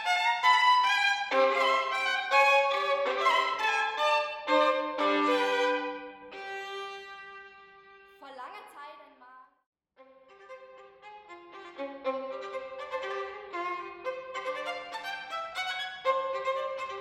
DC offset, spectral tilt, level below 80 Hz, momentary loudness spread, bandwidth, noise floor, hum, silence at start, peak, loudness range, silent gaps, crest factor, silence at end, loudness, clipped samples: under 0.1%; -1 dB/octave; -76 dBFS; 22 LU; 16 kHz; -59 dBFS; none; 0 s; -10 dBFS; 24 LU; 9.66-9.73 s; 20 dB; 0 s; -28 LUFS; under 0.1%